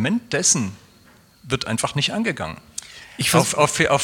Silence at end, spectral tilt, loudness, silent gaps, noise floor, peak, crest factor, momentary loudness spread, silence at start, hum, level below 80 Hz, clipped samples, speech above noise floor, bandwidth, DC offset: 0 s; -3 dB/octave; -20 LUFS; none; -52 dBFS; -2 dBFS; 20 dB; 16 LU; 0 s; none; -52 dBFS; under 0.1%; 31 dB; 17.5 kHz; under 0.1%